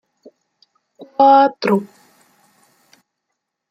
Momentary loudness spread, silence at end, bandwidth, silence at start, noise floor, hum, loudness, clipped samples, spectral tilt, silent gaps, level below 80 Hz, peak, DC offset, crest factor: 11 LU; 1.85 s; 10 kHz; 1 s; -77 dBFS; none; -14 LUFS; under 0.1%; -7 dB/octave; none; -74 dBFS; -2 dBFS; under 0.1%; 18 dB